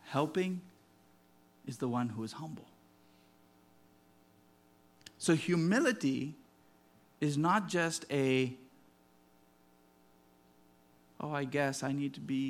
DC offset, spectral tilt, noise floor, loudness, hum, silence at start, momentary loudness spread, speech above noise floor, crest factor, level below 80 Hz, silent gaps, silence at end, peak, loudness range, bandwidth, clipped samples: under 0.1%; -5.5 dB/octave; -66 dBFS; -34 LUFS; none; 0.05 s; 17 LU; 33 dB; 22 dB; -80 dBFS; none; 0 s; -16 dBFS; 10 LU; 15.5 kHz; under 0.1%